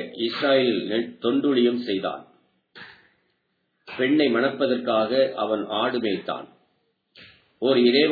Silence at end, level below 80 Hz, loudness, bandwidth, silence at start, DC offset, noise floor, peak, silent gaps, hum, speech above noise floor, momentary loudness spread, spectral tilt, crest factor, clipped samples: 0 s; -74 dBFS; -23 LUFS; 4.9 kHz; 0 s; under 0.1%; -73 dBFS; -6 dBFS; none; none; 51 dB; 12 LU; -7.5 dB/octave; 18 dB; under 0.1%